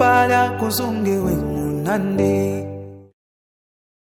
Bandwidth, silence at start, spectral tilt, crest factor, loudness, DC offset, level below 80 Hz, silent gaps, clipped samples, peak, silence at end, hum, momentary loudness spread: 18 kHz; 0 s; -5.5 dB/octave; 18 dB; -19 LUFS; under 0.1%; -44 dBFS; none; under 0.1%; -2 dBFS; 1.1 s; none; 13 LU